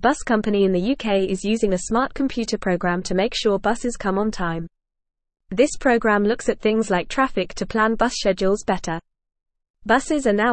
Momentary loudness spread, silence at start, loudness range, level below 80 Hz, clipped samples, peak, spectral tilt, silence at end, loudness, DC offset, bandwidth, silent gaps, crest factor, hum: 7 LU; 0 s; 3 LU; -42 dBFS; under 0.1%; -4 dBFS; -5 dB/octave; 0 s; -21 LUFS; 0.5%; 8.8 kHz; 9.70-9.74 s; 16 dB; none